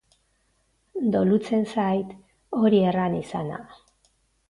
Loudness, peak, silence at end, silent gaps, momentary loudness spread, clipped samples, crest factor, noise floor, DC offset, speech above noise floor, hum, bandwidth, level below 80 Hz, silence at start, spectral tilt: -24 LUFS; -8 dBFS; 0.75 s; none; 15 LU; under 0.1%; 18 dB; -68 dBFS; under 0.1%; 45 dB; none; 11 kHz; -60 dBFS; 0.95 s; -8 dB/octave